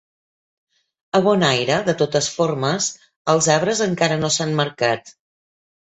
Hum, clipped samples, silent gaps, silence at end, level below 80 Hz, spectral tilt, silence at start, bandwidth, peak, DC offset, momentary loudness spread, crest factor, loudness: none; under 0.1%; 3.16-3.25 s; 0.75 s; -58 dBFS; -4 dB/octave; 1.15 s; 8.2 kHz; -2 dBFS; under 0.1%; 6 LU; 18 dB; -19 LUFS